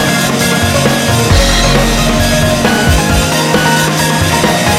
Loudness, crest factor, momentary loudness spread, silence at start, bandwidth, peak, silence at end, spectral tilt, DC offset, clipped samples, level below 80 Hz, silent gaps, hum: -10 LUFS; 10 dB; 2 LU; 0 s; 16.5 kHz; 0 dBFS; 0 s; -4 dB/octave; under 0.1%; under 0.1%; -20 dBFS; none; none